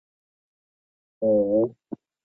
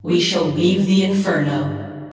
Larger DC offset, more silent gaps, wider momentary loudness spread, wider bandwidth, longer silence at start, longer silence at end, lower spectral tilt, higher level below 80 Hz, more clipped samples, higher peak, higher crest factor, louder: neither; neither; first, 20 LU vs 8 LU; second, 1.3 kHz vs 8 kHz; first, 1.2 s vs 0.05 s; first, 0.55 s vs 0 s; first, -14 dB/octave vs -5.5 dB/octave; second, -66 dBFS vs -52 dBFS; neither; second, -12 dBFS vs -4 dBFS; about the same, 16 dB vs 14 dB; second, -23 LUFS vs -18 LUFS